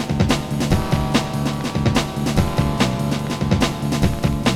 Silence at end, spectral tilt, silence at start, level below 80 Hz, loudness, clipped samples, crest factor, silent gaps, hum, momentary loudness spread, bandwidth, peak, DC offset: 0 s; -5.5 dB/octave; 0 s; -30 dBFS; -20 LUFS; under 0.1%; 16 dB; none; none; 3 LU; 16.5 kHz; -2 dBFS; under 0.1%